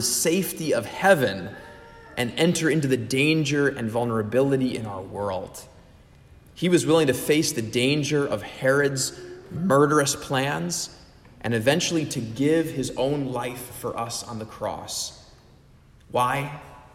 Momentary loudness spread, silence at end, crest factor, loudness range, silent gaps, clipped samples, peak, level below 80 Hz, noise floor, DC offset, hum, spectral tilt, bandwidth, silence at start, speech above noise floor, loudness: 13 LU; 0.15 s; 20 dB; 6 LU; none; under 0.1%; -4 dBFS; -54 dBFS; -53 dBFS; under 0.1%; none; -4.5 dB/octave; 16 kHz; 0 s; 29 dB; -24 LUFS